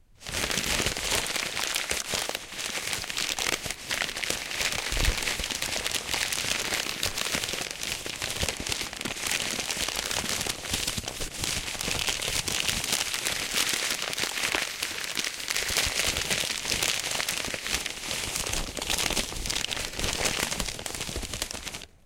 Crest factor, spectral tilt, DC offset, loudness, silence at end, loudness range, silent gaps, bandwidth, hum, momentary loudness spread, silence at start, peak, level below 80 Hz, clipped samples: 24 dB; -1 dB/octave; under 0.1%; -28 LUFS; 0.2 s; 2 LU; none; 17 kHz; none; 6 LU; 0.2 s; -8 dBFS; -44 dBFS; under 0.1%